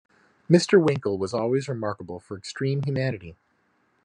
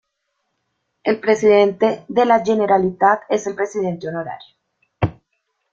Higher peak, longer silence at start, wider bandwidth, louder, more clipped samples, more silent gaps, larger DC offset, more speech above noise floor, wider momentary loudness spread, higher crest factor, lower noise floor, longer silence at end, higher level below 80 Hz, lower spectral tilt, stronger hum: about the same, -4 dBFS vs -2 dBFS; second, 0.5 s vs 1.05 s; first, 11 kHz vs 7.6 kHz; second, -24 LUFS vs -18 LUFS; neither; neither; neither; second, 44 dB vs 56 dB; first, 17 LU vs 12 LU; about the same, 22 dB vs 18 dB; second, -68 dBFS vs -73 dBFS; about the same, 0.7 s vs 0.6 s; second, -66 dBFS vs -52 dBFS; about the same, -6.5 dB/octave vs -6 dB/octave; neither